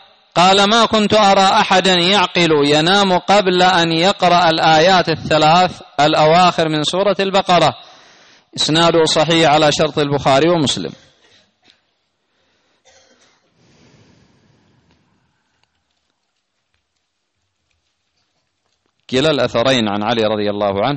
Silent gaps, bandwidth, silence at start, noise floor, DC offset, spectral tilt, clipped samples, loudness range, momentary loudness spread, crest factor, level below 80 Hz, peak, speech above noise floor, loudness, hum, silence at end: none; 8.8 kHz; 0.35 s; -70 dBFS; under 0.1%; -4 dB/octave; under 0.1%; 8 LU; 6 LU; 12 dB; -50 dBFS; -4 dBFS; 57 dB; -13 LUFS; none; 0 s